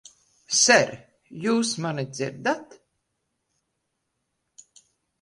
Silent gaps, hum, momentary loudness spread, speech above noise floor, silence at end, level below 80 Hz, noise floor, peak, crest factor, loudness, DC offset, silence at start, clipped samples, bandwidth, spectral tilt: none; none; 14 LU; 55 dB; 2.6 s; -70 dBFS; -78 dBFS; -4 dBFS; 24 dB; -23 LUFS; under 0.1%; 0.5 s; under 0.1%; 11.5 kHz; -2.5 dB/octave